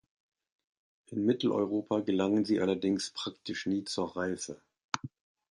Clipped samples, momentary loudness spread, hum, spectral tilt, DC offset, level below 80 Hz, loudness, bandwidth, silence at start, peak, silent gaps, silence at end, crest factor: under 0.1%; 10 LU; none; -5 dB/octave; under 0.1%; -68 dBFS; -32 LUFS; 11.5 kHz; 1.1 s; -10 dBFS; 4.84-4.89 s; 0.5 s; 22 dB